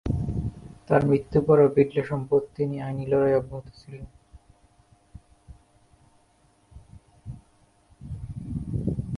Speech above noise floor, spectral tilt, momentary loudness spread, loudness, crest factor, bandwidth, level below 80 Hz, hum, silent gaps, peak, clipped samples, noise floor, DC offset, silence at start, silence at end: 39 dB; -9.5 dB/octave; 24 LU; -24 LUFS; 22 dB; 11 kHz; -44 dBFS; none; none; -4 dBFS; under 0.1%; -62 dBFS; under 0.1%; 0.05 s; 0 s